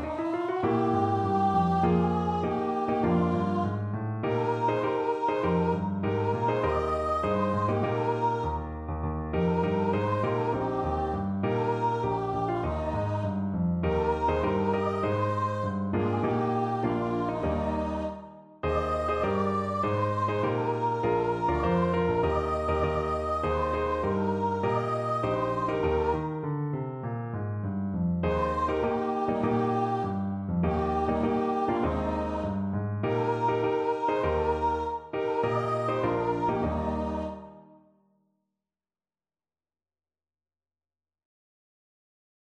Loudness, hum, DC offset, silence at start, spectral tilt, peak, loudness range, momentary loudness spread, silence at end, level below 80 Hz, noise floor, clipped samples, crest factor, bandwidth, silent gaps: -28 LUFS; none; under 0.1%; 0 s; -8.5 dB/octave; -12 dBFS; 3 LU; 5 LU; 4.95 s; -44 dBFS; under -90 dBFS; under 0.1%; 16 dB; 9.2 kHz; none